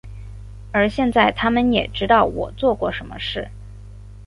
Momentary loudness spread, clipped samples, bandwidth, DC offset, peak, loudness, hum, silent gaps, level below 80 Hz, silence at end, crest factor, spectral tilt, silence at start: 22 LU; under 0.1%; 11.5 kHz; under 0.1%; -2 dBFS; -19 LUFS; 50 Hz at -35 dBFS; none; -38 dBFS; 0 s; 18 dB; -6.5 dB/octave; 0.05 s